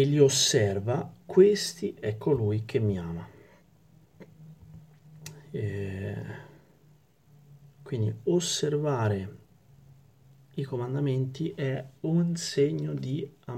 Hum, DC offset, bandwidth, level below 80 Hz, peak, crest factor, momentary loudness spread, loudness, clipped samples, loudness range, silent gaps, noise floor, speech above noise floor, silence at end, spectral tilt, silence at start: none; under 0.1%; 16 kHz; -62 dBFS; -8 dBFS; 22 dB; 18 LU; -28 LUFS; under 0.1%; 13 LU; none; -61 dBFS; 34 dB; 0 s; -5 dB/octave; 0 s